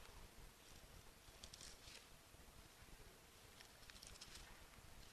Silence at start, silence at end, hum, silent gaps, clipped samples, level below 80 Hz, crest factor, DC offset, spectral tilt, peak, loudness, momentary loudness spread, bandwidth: 0 s; 0 s; none; none; under 0.1%; -68 dBFS; 28 dB; under 0.1%; -2 dB/octave; -34 dBFS; -61 LUFS; 6 LU; 13.5 kHz